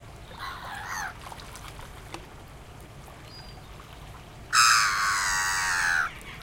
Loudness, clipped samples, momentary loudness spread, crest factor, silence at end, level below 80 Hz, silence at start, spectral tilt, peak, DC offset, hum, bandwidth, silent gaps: -24 LUFS; under 0.1%; 25 LU; 22 dB; 0 s; -50 dBFS; 0 s; 0 dB/octave; -8 dBFS; under 0.1%; none; 16.5 kHz; none